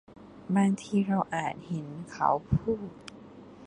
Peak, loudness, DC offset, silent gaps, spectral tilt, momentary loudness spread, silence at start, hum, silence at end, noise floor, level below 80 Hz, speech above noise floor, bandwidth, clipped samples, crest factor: -10 dBFS; -29 LUFS; under 0.1%; none; -7 dB/octave; 21 LU; 0.1 s; none; 0 s; -49 dBFS; -50 dBFS; 20 dB; 10.5 kHz; under 0.1%; 20 dB